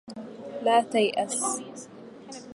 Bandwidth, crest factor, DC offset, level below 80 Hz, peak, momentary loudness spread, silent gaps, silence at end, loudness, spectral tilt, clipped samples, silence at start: 11.5 kHz; 18 dB; under 0.1%; -78 dBFS; -10 dBFS; 20 LU; none; 0 s; -26 LUFS; -2.5 dB/octave; under 0.1%; 0.05 s